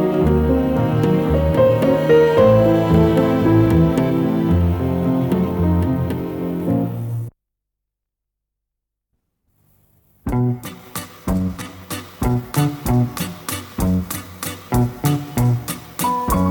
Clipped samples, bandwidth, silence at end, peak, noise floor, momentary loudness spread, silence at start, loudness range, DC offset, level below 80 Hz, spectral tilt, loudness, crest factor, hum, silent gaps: under 0.1%; over 20 kHz; 0 s; -2 dBFS; -82 dBFS; 14 LU; 0 s; 14 LU; under 0.1%; -34 dBFS; -7 dB/octave; -18 LUFS; 16 dB; 50 Hz at -50 dBFS; none